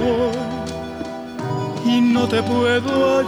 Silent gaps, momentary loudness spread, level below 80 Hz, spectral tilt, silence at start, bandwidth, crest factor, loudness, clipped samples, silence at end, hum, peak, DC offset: none; 12 LU; -48 dBFS; -6 dB/octave; 0 s; 12.5 kHz; 14 dB; -20 LUFS; under 0.1%; 0 s; none; -6 dBFS; under 0.1%